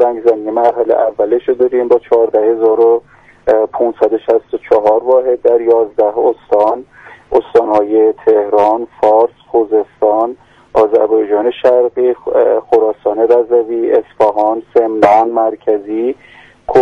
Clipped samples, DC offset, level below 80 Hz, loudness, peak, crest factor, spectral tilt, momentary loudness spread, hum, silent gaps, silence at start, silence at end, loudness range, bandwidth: under 0.1%; under 0.1%; -50 dBFS; -12 LUFS; 0 dBFS; 12 dB; -7 dB/octave; 5 LU; none; none; 0 s; 0 s; 1 LU; 5.8 kHz